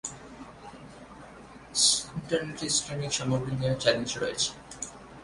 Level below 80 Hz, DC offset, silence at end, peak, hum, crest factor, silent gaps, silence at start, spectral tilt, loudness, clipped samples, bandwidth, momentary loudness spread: -56 dBFS; under 0.1%; 0 s; -8 dBFS; none; 22 dB; none; 0.05 s; -2.5 dB/octave; -27 LUFS; under 0.1%; 11.5 kHz; 25 LU